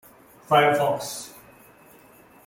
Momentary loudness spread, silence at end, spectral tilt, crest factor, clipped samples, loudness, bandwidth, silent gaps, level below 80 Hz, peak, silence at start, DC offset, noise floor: 17 LU; 1.15 s; -4 dB/octave; 22 dB; under 0.1%; -22 LUFS; 17 kHz; none; -66 dBFS; -4 dBFS; 0.5 s; under 0.1%; -52 dBFS